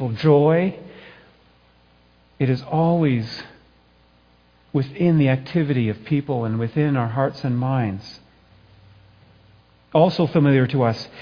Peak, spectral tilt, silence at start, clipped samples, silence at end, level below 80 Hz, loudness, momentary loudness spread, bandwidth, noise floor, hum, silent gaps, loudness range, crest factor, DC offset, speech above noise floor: -4 dBFS; -9 dB/octave; 0 s; under 0.1%; 0 s; -56 dBFS; -20 LUFS; 10 LU; 5.2 kHz; -56 dBFS; 60 Hz at -50 dBFS; none; 4 LU; 18 dB; under 0.1%; 37 dB